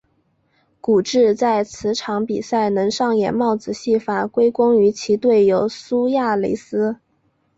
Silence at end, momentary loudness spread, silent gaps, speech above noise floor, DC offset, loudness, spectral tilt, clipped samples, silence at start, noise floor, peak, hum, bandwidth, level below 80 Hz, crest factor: 0.6 s; 8 LU; none; 47 dB; under 0.1%; -18 LUFS; -5.5 dB/octave; under 0.1%; 0.85 s; -64 dBFS; -6 dBFS; none; 8 kHz; -58 dBFS; 14 dB